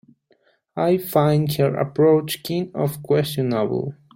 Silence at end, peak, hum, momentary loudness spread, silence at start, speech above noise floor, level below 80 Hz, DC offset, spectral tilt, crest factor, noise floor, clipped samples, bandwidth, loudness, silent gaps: 0.25 s; -4 dBFS; none; 8 LU; 0.75 s; 42 dB; -58 dBFS; under 0.1%; -6.5 dB/octave; 18 dB; -62 dBFS; under 0.1%; 16.5 kHz; -21 LUFS; none